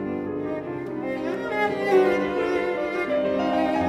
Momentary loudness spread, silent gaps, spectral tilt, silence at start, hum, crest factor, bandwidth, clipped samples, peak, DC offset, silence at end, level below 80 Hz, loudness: 10 LU; none; -6.5 dB/octave; 0 s; none; 16 dB; 12.5 kHz; under 0.1%; -8 dBFS; under 0.1%; 0 s; -56 dBFS; -25 LUFS